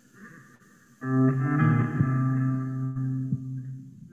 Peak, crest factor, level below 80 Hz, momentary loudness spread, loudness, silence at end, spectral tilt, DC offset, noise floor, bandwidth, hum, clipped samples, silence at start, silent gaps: -10 dBFS; 18 dB; -58 dBFS; 14 LU; -26 LUFS; 0.05 s; -10 dB/octave; under 0.1%; -56 dBFS; 7.4 kHz; none; under 0.1%; 0.2 s; none